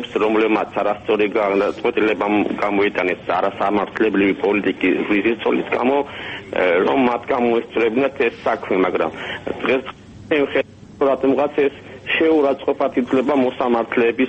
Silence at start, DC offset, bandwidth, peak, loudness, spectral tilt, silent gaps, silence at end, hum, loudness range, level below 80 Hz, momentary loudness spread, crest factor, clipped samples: 0 s; under 0.1%; 8.4 kHz; -6 dBFS; -19 LUFS; -6.5 dB/octave; none; 0 s; none; 2 LU; -54 dBFS; 5 LU; 14 dB; under 0.1%